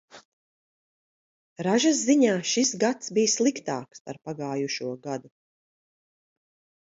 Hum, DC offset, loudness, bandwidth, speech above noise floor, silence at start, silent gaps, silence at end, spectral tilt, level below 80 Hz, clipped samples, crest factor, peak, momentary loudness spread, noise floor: none; under 0.1%; -25 LUFS; 8 kHz; over 65 dB; 0.15 s; 0.25-1.56 s, 4.00-4.05 s; 1.55 s; -3.5 dB/octave; -76 dBFS; under 0.1%; 18 dB; -8 dBFS; 15 LU; under -90 dBFS